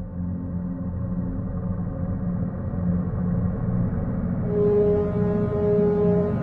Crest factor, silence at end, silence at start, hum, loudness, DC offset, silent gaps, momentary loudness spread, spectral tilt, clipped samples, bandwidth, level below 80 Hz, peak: 14 dB; 0 s; 0 s; none; -25 LUFS; under 0.1%; none; 9 LU; -12.5 dB/octave; under 0.1%; 3.1 kHz; -38 dBFS; -10 dBFS